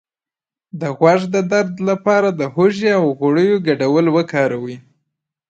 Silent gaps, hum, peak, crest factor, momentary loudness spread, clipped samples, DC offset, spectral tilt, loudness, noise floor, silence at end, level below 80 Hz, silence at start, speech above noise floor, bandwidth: none; none; 0 dBFS; 16 dB; 10 LU; under 0.1%; under 0.1%; -6.5 dB/octave; -16 LUFS; under -90 dBFS; 0.7 s; -64 dBFS; 0.75 s; over 75 dB; 8 kHz